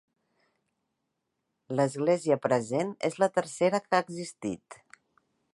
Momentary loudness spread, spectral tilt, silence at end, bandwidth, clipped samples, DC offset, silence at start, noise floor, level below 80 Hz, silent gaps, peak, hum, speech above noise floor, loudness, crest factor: 11 LU; -5.5 dB/octave; 0.8 s; 11.5 kHz; under 0.1%; under 0.1%; 1.7 s; -82 dBFS; -74 dBFS; none; -10 dBFS; none; 54 dB; -29 LUFS; 22 dB